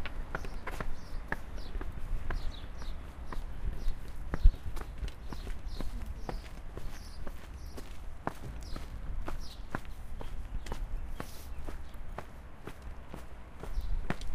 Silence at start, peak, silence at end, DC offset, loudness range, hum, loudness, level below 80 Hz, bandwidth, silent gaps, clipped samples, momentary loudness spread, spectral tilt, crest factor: 0 s; -8 dBFS; 0 s; under 0.1%; 7 LU; none; -43 LUFS; -36 dBFS; 14 kHz; none; under 0.1%; 7 LU; -5.5 dB/octave; 26 dB